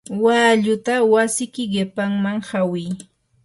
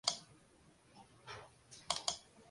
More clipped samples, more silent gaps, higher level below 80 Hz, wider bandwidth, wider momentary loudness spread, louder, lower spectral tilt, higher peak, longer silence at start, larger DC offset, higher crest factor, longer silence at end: neither; neither; first, -62 dBFS vs -74 dBFS; about the same, 12 kHz vs 11.5 kHz; second, 9 LU vs 24 LU; first, -19 LUFS vs -42 LUFS; first, -4.5 dB/octave vs 0 dB/octave; first, -4 dBFS vs -16 dBFS; about the same, 0.1 s vs 0.05 s; neither; second, 16 dB vs 32 dB; first, 0.4 s vs 0 s